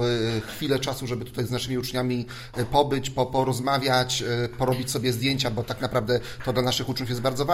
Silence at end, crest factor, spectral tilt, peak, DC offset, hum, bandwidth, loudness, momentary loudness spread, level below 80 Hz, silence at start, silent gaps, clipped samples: 0 s; 20 dB; -5 dB/octave; -6 dBFS; under 0.1%; none; 16 kHz; -26 LUFS; 6 LU; -46 dBFS; 0 s; none; under 0.1%